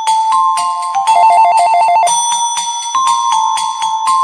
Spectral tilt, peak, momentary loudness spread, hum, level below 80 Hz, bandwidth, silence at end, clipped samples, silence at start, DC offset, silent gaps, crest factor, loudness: 1.5 dB/octave; 0 dBFS; 7 LU; none; -66 dBFS; 11 kHz; 0 s; under 0.1%; 0 s; under 0.1%; none; 10 dB; -11 LUFS